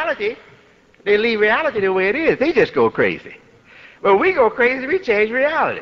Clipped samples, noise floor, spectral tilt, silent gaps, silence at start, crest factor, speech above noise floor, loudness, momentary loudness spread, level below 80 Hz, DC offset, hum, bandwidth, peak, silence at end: under 0.1%; -51 dBFS; -6.5 dB/octave; none; 0 s; 14 dB; 34 dB; -17 LUFS; 8 LU; -52 dBFS; under 0.1%; none; 6.6 kHz; -4 dBFS; 0 s